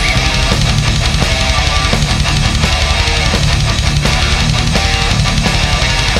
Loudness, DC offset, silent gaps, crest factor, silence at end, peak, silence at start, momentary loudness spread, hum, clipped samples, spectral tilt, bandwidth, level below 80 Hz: -12 LUFS; under 0.1%; none; 12 dB; 0 s; 0 dBFS; 0 s; 1 LU; none; under 0.1%; -3.5 dB/octave; 15 kHz; -16 dBFS